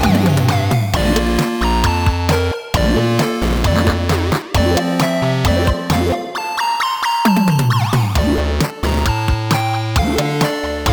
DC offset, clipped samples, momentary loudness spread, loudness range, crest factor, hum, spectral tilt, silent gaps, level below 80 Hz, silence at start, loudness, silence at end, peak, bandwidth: under 0.1%; under 0.1%; 4 LU; 1 LU; 14 dB; none; -5.5 dB/octave; none; -24 dBFS; 0 s; -16 LUFS; 0 s; -2 dBFS; over 20 kHz